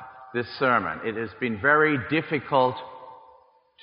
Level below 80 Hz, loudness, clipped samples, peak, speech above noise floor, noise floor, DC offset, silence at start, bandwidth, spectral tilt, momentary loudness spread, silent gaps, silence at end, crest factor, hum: -64 dBFS; -24 LUFS; under 0.1%; -6 dBFS; 33 dB; -57 dBFS; under 0.1%; 0 s; 5.4 kHz; -3.5 dB/octave; 14 LU; none; 0.65 s; 18 dB; none